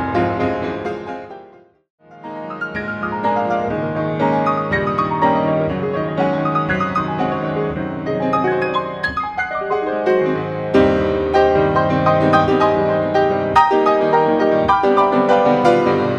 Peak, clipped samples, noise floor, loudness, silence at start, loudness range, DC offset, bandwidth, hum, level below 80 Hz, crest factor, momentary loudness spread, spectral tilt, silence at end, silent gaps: 0 dBFS; under 0.1%; -45 dBFS; -17 LUFS; 0 s; 8 LU; under 0.1%; 9 kHz; none; -44 dBFS; 16 dB; 10 LU; -7.5 dB/octave; 0 s; 1.90-1.98 s